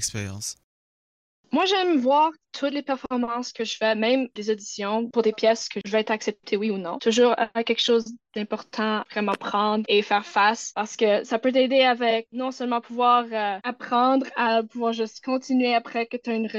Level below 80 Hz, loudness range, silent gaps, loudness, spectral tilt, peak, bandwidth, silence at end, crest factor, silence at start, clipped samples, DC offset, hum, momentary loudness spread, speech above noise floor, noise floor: -70 dBFS; 3 LU; 0.64-1.44 s; -24 LUFS; -3.5 dB/octave; -8 dBFS; 12 kHz; 0 s; 16 dB; 0 s; under 0.1%; under 0.1%; none; 9 LU; over 66 dB; under -90 dBFS